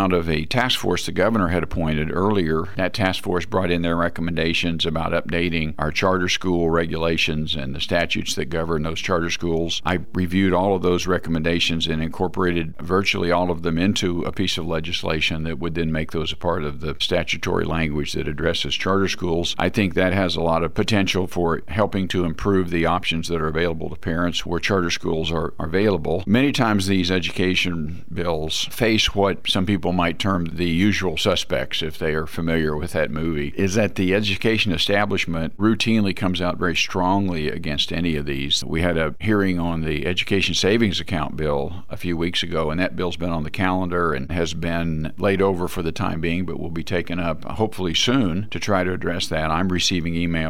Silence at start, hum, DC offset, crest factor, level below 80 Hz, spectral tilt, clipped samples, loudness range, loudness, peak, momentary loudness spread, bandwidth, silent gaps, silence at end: 0 s; none; 3%; 16 dB; -40 dBFS; -5 dB/octave; under 0.1%; 3 LU; -22 LUFS; -6 dBFS; 6 LU; 16.5 kHz; none; 0 s